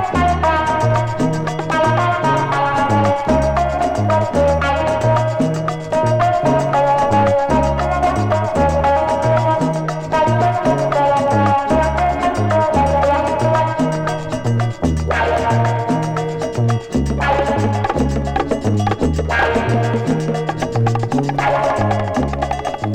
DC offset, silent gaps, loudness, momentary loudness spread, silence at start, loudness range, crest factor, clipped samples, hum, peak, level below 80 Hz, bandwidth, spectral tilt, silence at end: under 0.1%; none; -16 LUFS; 5 LU; 0 s; 3 LU; 14 dB; under 0.1%; none; -2 dBFS; -30 dBFS; 10.5 kHz; -7 dB/octave; 0 s